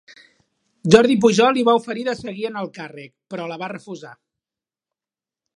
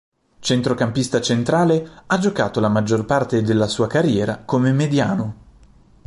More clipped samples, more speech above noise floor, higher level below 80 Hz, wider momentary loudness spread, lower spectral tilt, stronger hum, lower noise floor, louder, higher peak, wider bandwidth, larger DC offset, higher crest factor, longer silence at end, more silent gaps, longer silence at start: neither; first, over 71 dB vs 31 dB; second, -60 dBFS vs -50 dBFS; first, 21 LU vs 5 LU; about the same, -5 dB/octave vs -6 dB/octave; neither; first, under -90 dBFS vs -49 dBFS; about the same, -18 LUFS vs -19 LUFS; first, 0 dBFS vs -4 dBFS; about the same, 11 kHz vs 11.5 kHz; neither; about the same, 20 dB vs 16 dB; first, 1.45 s vs 0.75 s; neither; first, 0.85 s vs 0.4 s